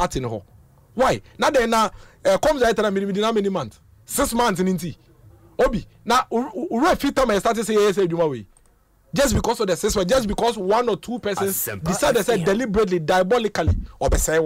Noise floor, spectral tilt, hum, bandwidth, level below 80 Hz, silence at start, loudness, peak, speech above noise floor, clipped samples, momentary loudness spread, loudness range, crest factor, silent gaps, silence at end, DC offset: -57 dBFS; -4.5 dB/octave; none; 16 kHz; -36 dBFS; 0 s; -21 LUFS; -10 dBFS; 37 dB; under 0.1%; 8 LU; 2 LU; 12 dB; none; 0 s; under 0.1%